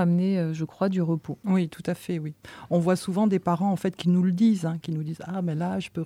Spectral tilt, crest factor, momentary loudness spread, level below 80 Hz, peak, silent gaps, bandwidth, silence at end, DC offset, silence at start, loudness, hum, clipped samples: -8 dB/octave; 14 dB; 9 LU; -64 dBFS; -12 dBFS; none; 13.5 kHz; 0 s; under 0.1%; 0 s; -26 LUFS; none; under 0.1%